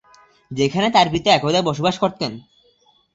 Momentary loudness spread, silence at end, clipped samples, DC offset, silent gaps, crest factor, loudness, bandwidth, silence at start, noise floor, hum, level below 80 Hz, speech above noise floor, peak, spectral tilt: 12 LU; 0.75 s; under 0.1%; under 0.1%; none; 18 dB; -18 LUFS; 8 kHz; 0.5 s; -58 dBFS; none; -52 dBFS; 40 dB; -2 dBFS; -5 dB/octave